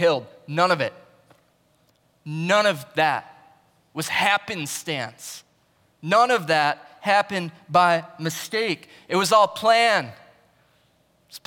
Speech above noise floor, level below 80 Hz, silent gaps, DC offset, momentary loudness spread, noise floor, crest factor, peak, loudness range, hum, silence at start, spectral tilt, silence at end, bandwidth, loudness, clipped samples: 41 dB; -74 dBFS; none; under 0.1%; 15 LU; -63 dBFS; 18 dB; -6 dBFS; 5 LU; none; 0 s; -3.5 dB/octave; 0.1 s; 18 kHz; -22 LUFS; under 0.1%